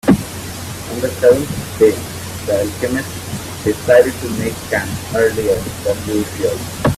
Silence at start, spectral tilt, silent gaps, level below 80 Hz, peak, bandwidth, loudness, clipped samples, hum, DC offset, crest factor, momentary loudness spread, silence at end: 0.05 s; -5 dB/octave; none; -40 dBFS; 0 dBFS; 16 kHz; -17 LUFS; under 0.1%; none; under 0.1%; 16 dB; 13 LU; 0 s